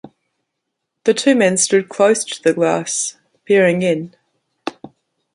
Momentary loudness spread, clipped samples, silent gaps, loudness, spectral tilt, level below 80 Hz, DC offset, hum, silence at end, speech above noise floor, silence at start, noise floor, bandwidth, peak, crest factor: 17 LU; under 0.1%; none; -16 LUFS; -3.5 dB/octave; -64 dBFS; under 0.1%; none; 0.45 s; 62 dB; 1.05 s; -77 dBFS; 11.5 kHz; -2 dBFS; 16 dB